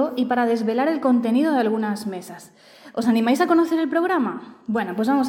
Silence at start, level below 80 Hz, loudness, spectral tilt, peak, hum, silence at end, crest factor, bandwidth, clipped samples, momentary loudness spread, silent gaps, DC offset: 0 s; -72 dBFS; -21 LUFS; -6 dB/octave; -8 dBFS; none; 0 s; 14 dB; 16.5 kHz; under 0.1%; 12 LU; none; under 0.1%